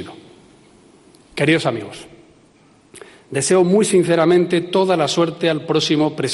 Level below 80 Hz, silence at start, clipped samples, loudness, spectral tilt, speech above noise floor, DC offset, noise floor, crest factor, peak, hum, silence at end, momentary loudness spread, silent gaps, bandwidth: -60 dBFS; 0 s; under 0.1%; -17 LUFS; -5 dB/octave; 35 dB; under 0.1%; -52 dBFS; 14 dB; -4 dBFS; none; 0 s; 15 LU; none; 11.5 kHz